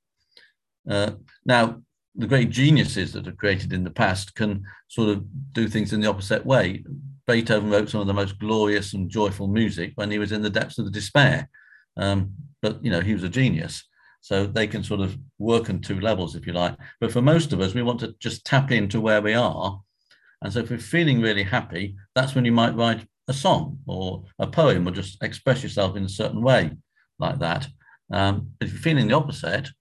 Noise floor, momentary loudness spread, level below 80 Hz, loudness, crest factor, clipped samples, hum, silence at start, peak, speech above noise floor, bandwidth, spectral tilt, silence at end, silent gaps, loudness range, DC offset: -60 dBFS; 11 LU; -46 dBFS; -23 LUFS; 20 dB; under 0.1%; none; 0.85 s; -4 dBFS; 37 dB; 12 kHz; -6 dB/octave; 0.1 s; 2.08-2.12 s; 3 LU; under 0.1%